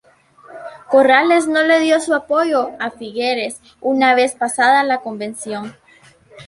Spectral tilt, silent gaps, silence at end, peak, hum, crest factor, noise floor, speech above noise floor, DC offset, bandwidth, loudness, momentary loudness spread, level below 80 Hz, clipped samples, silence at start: -3 dB/octave; none; 0.05 s; 0 dBFS; none; 16 dB; -49 dBFS; 33 dB; under 0.1%; 11.5 kHz; -16 LUFS; 15 LU; -64 dBFS; under 0.1%; 0.5 s